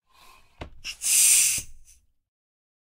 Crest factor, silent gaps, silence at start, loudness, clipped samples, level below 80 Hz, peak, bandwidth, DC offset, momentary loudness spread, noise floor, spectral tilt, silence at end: 22 dB; none; 0.6 s; -19 LUFS; under 0.1%; -54 dBFS; -6 dBFS; 16 kHz; under 0.1%; 21 LU; -54 dBFS; 2.5 dB/octave; 1.25 s